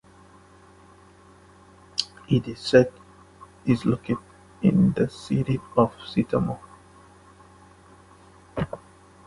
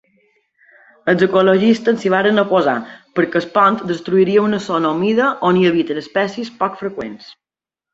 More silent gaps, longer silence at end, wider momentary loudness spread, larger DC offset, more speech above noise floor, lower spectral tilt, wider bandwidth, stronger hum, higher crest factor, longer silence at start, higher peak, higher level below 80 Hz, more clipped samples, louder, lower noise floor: neither; about the same, 0.5 s vs 0.6 s; about the same, 13 LU vs 11 LU; neither; second, 30 dB vs 72 dB; about the same, -7 dB/octave vs -6.5 dB/octave; first, 11.5 kHz vs 7.8 kHz; neither; first, 26 dB vs 16 dB; first, 2 s vs 1.05 s; about the same, -2 dBFS vs -2 dBFS; first, -52 dBFS vs -60 dBFS; neither; second, -25 LUFS vs -16 LUFS; second, -52 dBFS vs -87 dBFS